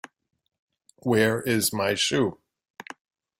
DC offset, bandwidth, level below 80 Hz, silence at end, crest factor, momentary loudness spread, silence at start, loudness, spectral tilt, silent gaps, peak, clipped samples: under 0.1%; 16.5 kHz; -62 dBFS; 1.05 s; 18 dB; 21 LU; 1.05 s; -24 LUFS; -4 dB/octave; none; -8 dBFS; under 0.1%